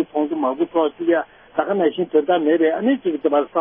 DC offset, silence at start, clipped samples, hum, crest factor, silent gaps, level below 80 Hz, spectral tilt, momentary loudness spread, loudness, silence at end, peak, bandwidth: under 0.1%; 0 s; under 0.1%; none; 14 dB; none; -64 dBFS; -10.5 dB/octave; 5 LU; -20 LUFS; 0 s; -4 dBFS; 3.7 kHz